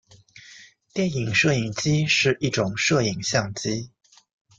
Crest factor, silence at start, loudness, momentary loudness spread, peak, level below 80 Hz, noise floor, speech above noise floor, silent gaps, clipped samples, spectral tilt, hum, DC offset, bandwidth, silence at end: 18 dB; 0.35 s; -23 LUFS; 9 LU; -6 dBFS; -56 dBFS; -49 dBFS; 27 dB; none; under 0.1%; -4 dB/octave; none; under 0.1%; 9.4 kHz; 0.7 s